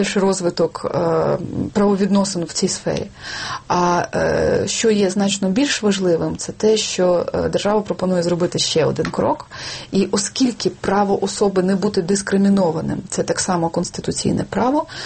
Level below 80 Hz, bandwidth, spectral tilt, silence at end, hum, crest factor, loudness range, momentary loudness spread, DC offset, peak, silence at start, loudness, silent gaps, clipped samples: -46 dBFS; 8.8 kHz; -4.5 dB/octave; 0 s; none; 14 dB; 2 LU; 6 LU; under 0.1%; -4 dBFS; 0 s; -19 LUFS; none; under 0.1%